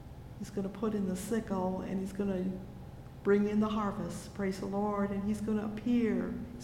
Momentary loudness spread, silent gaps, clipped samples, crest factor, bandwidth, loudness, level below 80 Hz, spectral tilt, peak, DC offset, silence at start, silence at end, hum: 11 LU; none; under 0.1%; 16 dB; 15.5 kHz; -34 LUFS; -54 dBFS; -7 dB/octave; -16 dBFS; under 0.1%; 0 s; 0 s; none